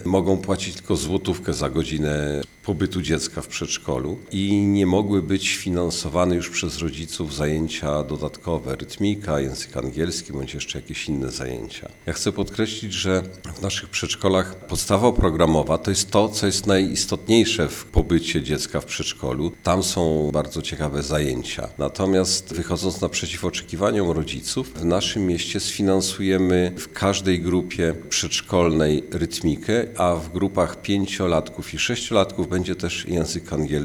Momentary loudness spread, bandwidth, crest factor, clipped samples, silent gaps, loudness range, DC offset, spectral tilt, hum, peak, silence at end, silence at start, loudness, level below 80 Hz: 8 LU; over 20 kHz; 20 dB; under 0.1%; none; 6 LU; under 0.1%; -4.5 dB/octave; none; -2 dBFS; 0 s; 0 s; -23 LUFS; -40 dBFS